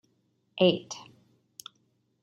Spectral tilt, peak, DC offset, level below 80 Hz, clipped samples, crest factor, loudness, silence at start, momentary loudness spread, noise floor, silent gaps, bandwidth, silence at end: -5 dB/octave; -10 dBFS; under 0.1%; -74 dBFS; under 0.1%; 22 dB; -26 LUFS; 0.55 s; 24 LU; -72 dBFS; none; 15 kHz; 1.2 s